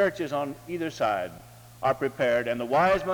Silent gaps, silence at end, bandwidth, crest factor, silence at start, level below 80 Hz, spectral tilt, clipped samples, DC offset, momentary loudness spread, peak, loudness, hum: none; 0 s; over 20 kHz; 16 dB; 0 s; -56 dBFS; -5.5 dB/octave; under 0.1%; under 0.1%; 10 LU; -10 dBFS; -27 LUFS; none